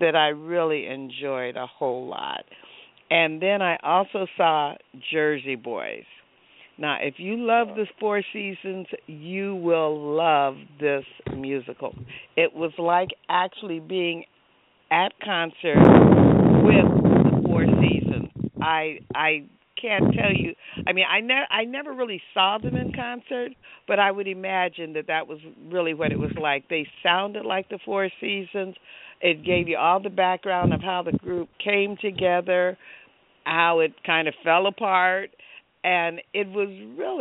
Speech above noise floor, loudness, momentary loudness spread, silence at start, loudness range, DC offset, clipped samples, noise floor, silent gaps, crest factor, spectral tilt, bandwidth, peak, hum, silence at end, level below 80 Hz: 38 dB; -23 LUFS; 13 LU; 0 s; 9 LU; under 0.1%; under 0.1%; -61 dBFS; none; 22 dB; -4 dB/octave; 4 kHz; 0 dBFS; none; 0 s; -50 dBFS